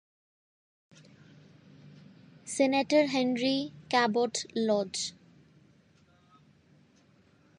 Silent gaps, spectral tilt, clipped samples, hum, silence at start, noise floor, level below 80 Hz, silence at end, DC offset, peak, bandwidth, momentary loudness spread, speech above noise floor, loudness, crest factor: none; -3.5 dB/octave; under 0.1%; none; 1.85 s; -63 dBFS; -76 dBFS; 2.5 s; under 0.1%; -12 dBFS; 11.5 kHz; 10 LU; 35 dB; -29 LUFS; 20 dB